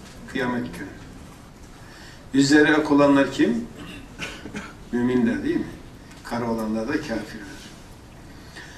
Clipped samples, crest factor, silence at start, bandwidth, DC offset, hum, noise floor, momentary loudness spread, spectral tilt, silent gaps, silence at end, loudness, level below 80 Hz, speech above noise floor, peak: under 0.1%; 20 dB; 0 s; 13.5 kHz; under 0.1%; none; -44 dBFS; 25 LU; -5 dB/octave; none; 0 s; -22 LUFS; -48 dBFS; 22 dB; -4 dBFS